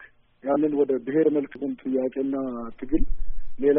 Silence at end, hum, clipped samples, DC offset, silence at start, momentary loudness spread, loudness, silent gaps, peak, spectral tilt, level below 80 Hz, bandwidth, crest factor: 0 s; none; under 0.1%; under 0.1%; 0 s; 13 LU; -26 LUFS; none; -8 dBFS; -8 dB/octave; -34 dBFS; 3.5 kHz; 16 dB